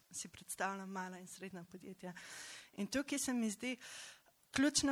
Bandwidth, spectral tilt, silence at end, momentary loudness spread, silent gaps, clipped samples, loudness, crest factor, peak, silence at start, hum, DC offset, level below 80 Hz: 16.5 kHz; -2.5 dB/octave; 0 s; 15 LU; none; under 0.1%; -42 LUFS; 22 dB; -20 dBFS; 0.1 s; none; under 0.1%; -72 dBFS